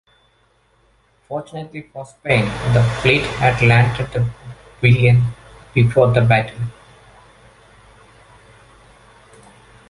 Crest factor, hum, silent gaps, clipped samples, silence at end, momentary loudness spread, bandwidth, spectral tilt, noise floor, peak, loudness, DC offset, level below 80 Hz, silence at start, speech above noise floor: 18 dB; none; none; under 0.1%; 3.2 s; 18 LU; 11 kHz; -7 dB/octave; -58 dBFS; -2 dBFS; -16 LUFS; under 0.1%; -42 dBFS; 1.3 s; 43 dB